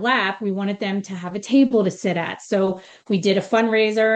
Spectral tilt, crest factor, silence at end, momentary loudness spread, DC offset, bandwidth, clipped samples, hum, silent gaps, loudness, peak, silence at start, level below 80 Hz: -5.5 dB/octave; 14 dB; 0 s; 9 LU; under 0.1%; 8.8 kHz; under 0.1%; none; none; -21 LUFS; -6 dBFS; 0 s; -68 dBFS